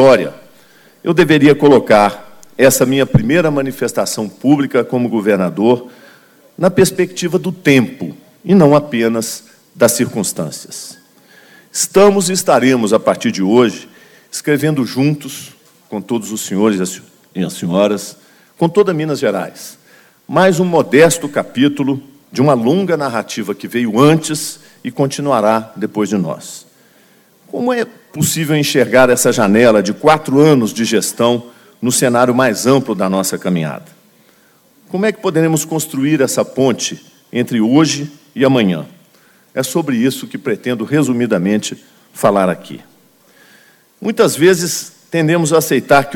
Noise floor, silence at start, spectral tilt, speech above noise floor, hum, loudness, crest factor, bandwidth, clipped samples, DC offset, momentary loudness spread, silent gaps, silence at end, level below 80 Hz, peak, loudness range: -50 dBFS; 0 s; -5 dB/octave; 37 dB; none; -14 LUFS; 14 dB; 18 kHz; under 0.1%; under 0.1%; 15 LU; none; 0 s; -48 dBFS; 0 dBFS; 6 LU